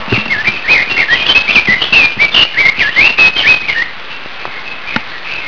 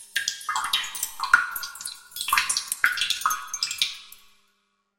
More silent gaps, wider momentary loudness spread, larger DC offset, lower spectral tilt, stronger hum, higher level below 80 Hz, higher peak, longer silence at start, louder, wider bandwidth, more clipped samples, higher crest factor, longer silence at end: neither; first, 17 LU vs 11 LU; first, 5% vs 0.1%; first, -2.5 dB/octave vs 3.5 dB/octave; neither; first, -40 dBFS vs -62 dBFS; about the same, 0 dBFS vs -2 dBFS; about the same, 0 s vs 0 s; first, -8 LUFS vs -25 LUFS; second, 5.4 kHz vs 17 kHz; first, 0.6% vs under 0.1%; second, 12 dB vs 26 dB; second, 0 s vs 0.85 s